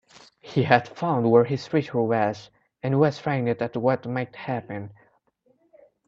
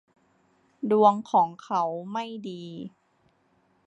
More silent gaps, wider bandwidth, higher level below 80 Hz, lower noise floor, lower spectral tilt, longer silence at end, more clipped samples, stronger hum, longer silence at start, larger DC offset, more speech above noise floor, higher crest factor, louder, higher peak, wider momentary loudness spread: neither; about the same, 7.6 kHz vs 8.2 kHz; first, -64 dBFS vs -78 dBFS; about the same, -66 dBFS vs -67 dBFS; about the same, -8 dB/octave vs -7 dB/octave; first, 1.15 s vs 1 s; neither; neither; second, 0.45 s vs 0.8 s; neither; about the same, 42 dB vs 42 dB; about the same, 24 dB vs 20 dB; about the same, -24 LUFS vs -25 LUFS; first, -2 dBFS vs -6 dBFS; second, 13 LU vs 19 LU